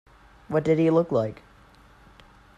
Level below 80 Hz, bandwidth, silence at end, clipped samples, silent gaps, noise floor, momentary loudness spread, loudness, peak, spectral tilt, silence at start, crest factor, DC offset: -56 dBFS; 9 kHz; 1.25 s; under 0.1%; none; -53 dBFS; 8 LU; -24 LUFS; -8 dBFS; -8.5 dB/octave; 0.5 s; 18 dB; under 0.1%